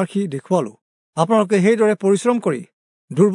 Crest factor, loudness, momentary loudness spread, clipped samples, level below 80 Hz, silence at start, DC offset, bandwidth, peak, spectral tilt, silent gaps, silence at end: 16 dB; -18 LUFS; 13 LU; under 0.1%; -74 dBFS; 0 s; under 0.1%; 11 kHz; -2 dBFS; -6.5 dB/octave; 0.81-1.13 s, 2.73-3.08 s; 0 s